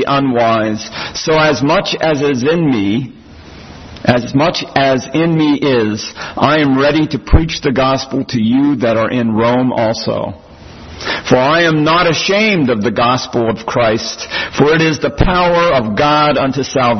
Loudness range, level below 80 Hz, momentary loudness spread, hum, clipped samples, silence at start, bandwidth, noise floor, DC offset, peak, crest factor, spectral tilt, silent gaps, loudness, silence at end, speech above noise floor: 2 LU; -30 dBFS; 8 LU; none; under 0.1%; 0 s; 6.4 kHz; -35 dBFS; under 0.1%; 0 dBFS; 12 dB; -5.5 dB/octave; none; -13 LUFS; 0 s; 22 dB